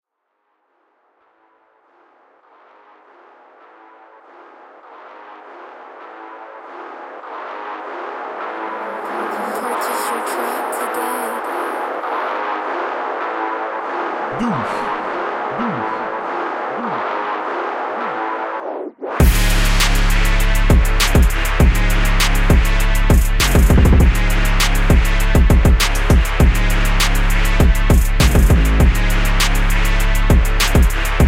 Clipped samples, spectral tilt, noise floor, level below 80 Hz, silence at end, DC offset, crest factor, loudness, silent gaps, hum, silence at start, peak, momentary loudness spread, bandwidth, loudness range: under 0.1%; -5 dB/octave; -70 dBFS; -18 dBFS; 0 s; under 0.1%; 14 dB; -17 LUFS; none; none; 4.9 s; -2 dBFS; 14 LU; 16.5 kHz; 14 LU